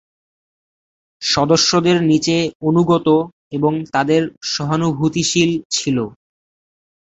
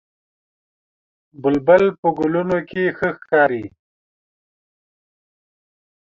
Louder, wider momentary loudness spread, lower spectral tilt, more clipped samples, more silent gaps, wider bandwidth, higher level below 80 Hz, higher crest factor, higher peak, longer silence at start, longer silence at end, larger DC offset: about the same, -16 LUFS vs -18 LUFS; about the same, 8 LU vs 10 LU; second, -4.5 dB/octave vs -8 dB/octave; neither; first, 2.55-2.60 s, 3.32-3.51 s, 4.37-4.41 s, 5.65-5.70 s vs 1.98-2.03 s; first, 8.2 kHz vs 7 kHz; first, -52 dBFS vs -58 dBFS; about the same, 16 dB vs 20 dB; about the same, -2 dBFS vs -2 dBFS; second, 1.2 s vs 1.4 s; second, 0.95 s vs 2.35 s; neither